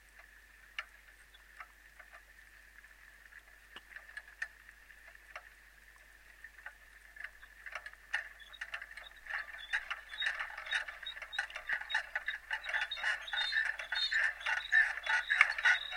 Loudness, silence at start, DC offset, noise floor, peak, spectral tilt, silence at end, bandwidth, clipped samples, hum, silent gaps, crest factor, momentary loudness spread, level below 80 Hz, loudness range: -35 LUFS; 0.15 s; under 0.1%; -60 dBFS; -6 dBFS; 1 dB/octave; 0 s; 16.5 kHz; under 0.1%; none; none; 32 dB; 26 LU; -66 dBFS; 20 LU